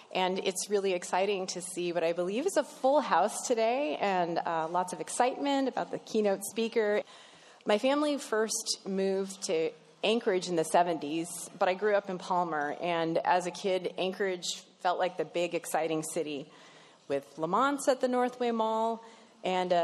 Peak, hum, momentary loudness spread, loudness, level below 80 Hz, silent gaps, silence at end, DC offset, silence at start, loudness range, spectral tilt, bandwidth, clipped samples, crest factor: -10 dBFS; none; 7 LU; -31 LUFS; -86 dBFS; none; 0 s; under 0.1%; 0 s; 3 LU; -3.5 dB/octave; 13 kHz; under 0.1%; 20 dB